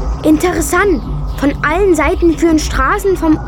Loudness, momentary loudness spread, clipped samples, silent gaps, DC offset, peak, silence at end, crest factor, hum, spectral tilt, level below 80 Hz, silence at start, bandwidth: -13 LUFS; 5 LU; under 0.1%; none; under 0.1%; -2 dBFS; 0 s; 12 dB; none; -5.5 dB/octave; -22 dBFS; 0 s; 17.5 kHz